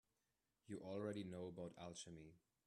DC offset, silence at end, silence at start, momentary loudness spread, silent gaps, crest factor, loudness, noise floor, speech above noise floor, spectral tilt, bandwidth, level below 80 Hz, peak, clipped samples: under 0.1%; 0.3 s; 0.7 s; 10 LU; none; 18 dB; -53 LUFS; under -90 dBFS; over 38 dB; -5.5 dB/octave; 12 kHz; -82 dBFS; -36 dBFS; under 0.1%